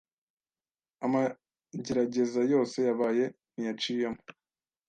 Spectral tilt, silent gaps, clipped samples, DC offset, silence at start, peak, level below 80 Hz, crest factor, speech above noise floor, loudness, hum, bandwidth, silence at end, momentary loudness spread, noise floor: -5.5 dB/octave; none; under 0.1%; under 0.1%; 1 s; -16 dBFS; -70 dBFS; 16 dB; over 61 dB; -30 LUFS; none; 9.2 kHz; 0.6 s; 10 LU; under -90 dBFS